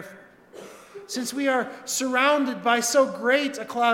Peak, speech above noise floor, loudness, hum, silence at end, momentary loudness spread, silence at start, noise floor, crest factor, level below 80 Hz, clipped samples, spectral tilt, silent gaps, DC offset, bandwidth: -6 dBFS; 24 dB; -23 LUFS; none; 0 s; 23 LU; 0 s; -47 dBFS; 18 dB; -76 dBFS; under 0.1%; -2 dB/octave; none; under 0.1%; 17 kHz